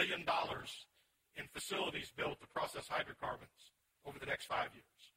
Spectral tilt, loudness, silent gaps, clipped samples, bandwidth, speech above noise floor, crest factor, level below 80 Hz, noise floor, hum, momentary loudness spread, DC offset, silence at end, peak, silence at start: -3 dB/octave; -42 LUFS; none; under 0.1%; 16.5 kHz; 34 dB; 22 dB; -70 dBFS; -77 dBFS; none; 16 LU; under 0.1%; 0.1 s; -22 dBFS; 0 s